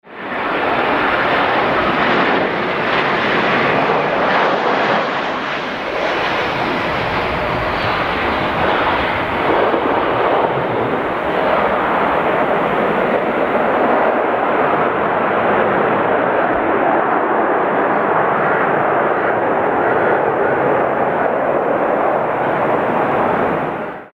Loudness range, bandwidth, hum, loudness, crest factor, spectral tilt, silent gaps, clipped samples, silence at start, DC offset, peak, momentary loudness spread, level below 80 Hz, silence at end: 2 LU; 15.5 kHz; none; -16 LUFS; 14 dB; -6.5 dB/octave; none; under 0.1%; 0.05 s; under 0.1%; -2 dBFS; 3 LU; -44 dBFS; 0.1 s